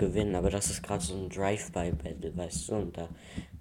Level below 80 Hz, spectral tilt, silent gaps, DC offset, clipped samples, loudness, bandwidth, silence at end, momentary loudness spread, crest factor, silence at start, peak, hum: -44 dBFS; -5 dB/octave; none; under 0.1%; under 0.1%; -33 LUFS; 17 kHz; 0 s; 12 LU; 20 dB; 0 s; -14 dBFS; none